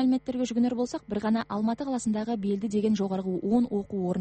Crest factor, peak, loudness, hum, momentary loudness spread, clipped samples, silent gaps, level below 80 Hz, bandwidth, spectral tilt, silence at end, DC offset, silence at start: 14 dB; -14 dBFS; -28 LUFS; none; 4 LU; under 0.1%; none; -60 dBFS; 8.4 kHz; -6.5 dB/octave; 0 s; under 0.1%; 0 s